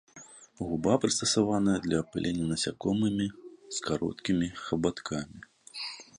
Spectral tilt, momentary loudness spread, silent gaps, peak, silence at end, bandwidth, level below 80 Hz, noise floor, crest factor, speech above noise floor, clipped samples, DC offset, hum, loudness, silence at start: -4.5 dB/octave; 16 LU; none; -10 dBFS; 0.15 s; 11.5 kHz; -56 dBFS; -52 dBFS; 22 dB; 23 dB; under 0.1%; under 0.1%; none; -30 LUFS; 0.15 s